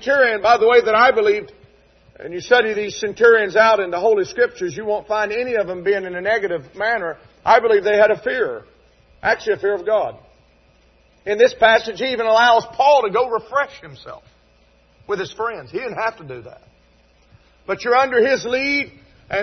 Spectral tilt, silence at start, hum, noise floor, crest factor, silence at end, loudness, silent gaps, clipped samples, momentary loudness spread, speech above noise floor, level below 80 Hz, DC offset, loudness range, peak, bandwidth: -3.5 dB/octave; 0 s; none; -55 dBFS; 18 dB; 0 s; -17 LUFS; none; under 0.1%; 14 LU; 38 dB; -54 dBFS; under 0.1%; 9 LU; 0 dBFS; 6.4 kHz